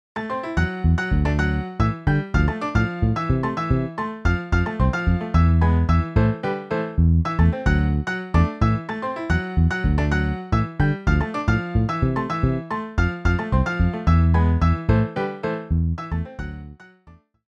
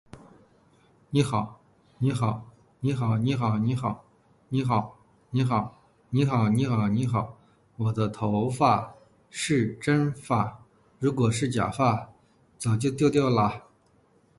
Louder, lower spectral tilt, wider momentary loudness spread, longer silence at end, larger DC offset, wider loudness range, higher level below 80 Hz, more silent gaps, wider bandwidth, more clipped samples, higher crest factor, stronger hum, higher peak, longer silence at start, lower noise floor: first, -22 LUFS vs -26 LUFS; first, -8 dB/octave vs -6.5 dB/octave; second, 7 LU vs 10 LU; second, 0.4 s vs 0.8 s; neither; about the same, 2 LU vs 2 LU; first, -28 dBFS vs -56 dBFS; neither; second, 7.4 kHz vs 11.5 kHz; neither; about the same, 16 dB vs 20 dB; neither; first, -4 dBFS vs -8 dBFS; about the same, 0.15 s vs 0.15 s; second, -51 dBFS vs -63 dBFS